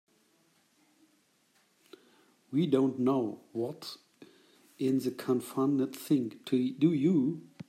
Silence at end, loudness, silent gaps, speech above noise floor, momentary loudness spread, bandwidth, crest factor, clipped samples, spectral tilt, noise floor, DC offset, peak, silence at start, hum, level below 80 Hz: 0.05 s; -30 LUFS; none; 40 dB; 10 LU; 15.5 kHz; 18 dB; under 0.1%; -7.5 dB/octave; -70 dBFS; under 0.1%; -14 dBFS; 2.5 s; none; -80 dBFS